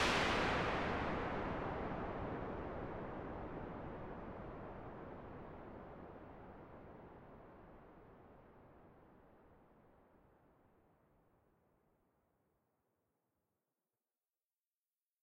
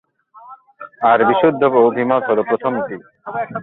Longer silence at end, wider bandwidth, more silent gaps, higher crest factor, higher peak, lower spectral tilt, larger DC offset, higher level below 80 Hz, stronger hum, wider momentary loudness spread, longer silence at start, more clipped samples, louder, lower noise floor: first, 5.35 s vs 0 s; first, 13 kHz vs 4.1 kHz; neither; first, 22 dB vs 16 dB; second, -24 dBFS vs -2 dBFS; second, -5 dB/octave vs -10.5 dB/octave; neither; about the same, -58 dBFS vs -60 dBFS; neither; first, 25 LU vs 15 LU; second, 0 s vs 0.35 s; neither; second, -43 LUFS vs -16 LUFS; first, under -90 dBFS vs -42 dBFS